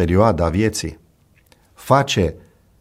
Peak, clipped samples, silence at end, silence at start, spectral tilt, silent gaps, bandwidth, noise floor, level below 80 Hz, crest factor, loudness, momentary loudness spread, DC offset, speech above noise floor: -2 dBFS; under 0.1%; 0.4 s; 0 s; -5.5 dB/octave; none; 16 kHz; -55 dBFS; -36 dBFS; 18 dB; -18 LUFS; 13 LU; under 0.1%; 38 dB